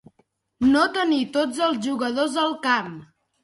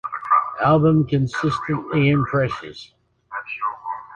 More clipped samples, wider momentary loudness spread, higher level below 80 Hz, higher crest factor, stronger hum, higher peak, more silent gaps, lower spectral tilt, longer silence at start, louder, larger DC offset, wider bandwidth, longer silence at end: neither; second, 6 LU vs 16 LU; second, -58 dBFS vs -50 dBFS; about the same, 16 dB vs 16 dB; neither; about the same, -6 dBFS vs -4 dBFS; neither; second, -4 dB/octave vs -8 dB/octave; first, 0.6 s vs 0.05 s; about the same, -22 LUFS vs -20 LUFS; neither; first, 11.5 kHz vs 8.6 kHz; first, 0.4 s vs 0 s